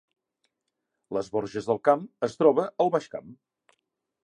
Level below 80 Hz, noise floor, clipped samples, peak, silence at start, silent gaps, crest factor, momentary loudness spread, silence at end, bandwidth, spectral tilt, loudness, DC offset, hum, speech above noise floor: -70 dBFS; -82 dBFS; under 0.1%; -6 dBFS; 1.1 s; none; 22 dB; 11 LU; 0.9 s; 9.8 kHz; -6.5 dB/octave; -26 LUFS; under 0.1%; none; 57 dB